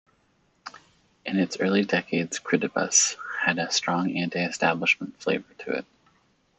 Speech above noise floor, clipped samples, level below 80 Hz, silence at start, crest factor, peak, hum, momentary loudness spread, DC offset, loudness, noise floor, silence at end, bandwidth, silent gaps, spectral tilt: 41 dB; under 0.1%; -72 dBFS; 0.65 s; 20 dB; -6 dBFS; none; 12 LU; under 0.1%; -25 LUFS; -67 dBFS; 0.75 s; 8.4 kHz; none; -3 dB/octave